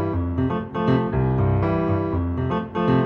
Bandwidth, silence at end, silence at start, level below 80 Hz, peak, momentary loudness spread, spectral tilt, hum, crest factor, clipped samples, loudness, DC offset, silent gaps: 5.4 kHz; 0 s; 0 s; -36 dBFS; -8 dBFS; 4 LU; -10.5 dB/octave; none; 14 dB; under 0.1%; -22 LUFS; under 0.1%; none